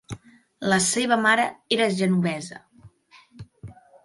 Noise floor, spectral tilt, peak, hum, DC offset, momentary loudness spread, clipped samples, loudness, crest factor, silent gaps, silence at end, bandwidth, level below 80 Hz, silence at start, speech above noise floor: -54 dBFS; -3.5 dB/octave; -6 dBFS; none; under 0.1%; 21 LU; under 0.1%; -22 LUFS; 18 dB; none; 0.3 s; 11.5 kHz; -60 dBFS; 0.1 s; 32 dB